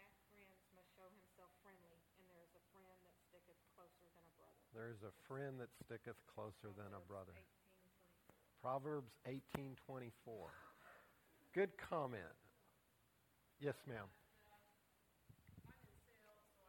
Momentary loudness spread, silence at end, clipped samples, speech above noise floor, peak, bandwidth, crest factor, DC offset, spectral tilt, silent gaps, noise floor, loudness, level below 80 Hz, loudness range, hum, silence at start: 22 LU; 0 s; under 0.1%; 28 dB; -26 dBFS; 18 kHz; 30 dB; under 0.1%; -6.5 dB/octave; none; -79 dBFS; -51 LUFS; -82 dBFS; 8 LU; none; 0 s